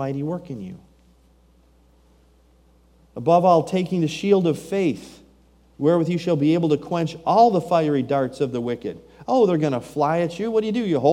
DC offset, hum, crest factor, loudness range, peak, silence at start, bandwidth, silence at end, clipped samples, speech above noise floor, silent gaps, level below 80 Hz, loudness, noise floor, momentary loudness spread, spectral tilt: under 0.1%; none; 18 dB; 4 LU; -4 dBFS; 0 s; 15.5 kHz; 0 s; under 0.1%; 35 dB; none; -58 dBFS; -21 LUFS; -56 dBFS; 13 LU; -7.5 dB/octave